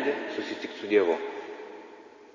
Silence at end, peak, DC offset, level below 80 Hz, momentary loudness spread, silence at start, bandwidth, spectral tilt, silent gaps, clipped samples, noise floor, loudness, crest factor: 0.05 s; -10 dBFS; under 0.1%; -76 dBFS; 22 LU; 0 s; 7.4 kHz; -4.5 dB/octave; none; under 0.1%; -49 dBFS; -29 LUFS; 20 dB